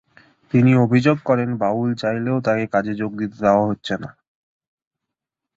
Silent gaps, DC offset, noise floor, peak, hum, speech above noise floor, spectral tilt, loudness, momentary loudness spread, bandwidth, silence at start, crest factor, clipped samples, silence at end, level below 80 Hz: none; under 0.1%; -84 dBFS; -2 dBFS; none; 66 dB; -8 dB/octave; -19 LUFS; 11 LU; 7.6 kHz; 0.55 s; 18 dB; under 0.1%; 1.45 s; -56 dBFS